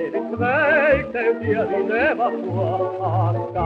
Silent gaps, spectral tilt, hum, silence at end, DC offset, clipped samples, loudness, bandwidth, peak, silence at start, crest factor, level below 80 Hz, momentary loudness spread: none; -9 dB/octave; none; 0 s; under 0.1%; under 0.1%; -20 LUFS; 5.6 kHz; -6 dBFS; 0 s; 14 dB; -48 dBFS; 6 LU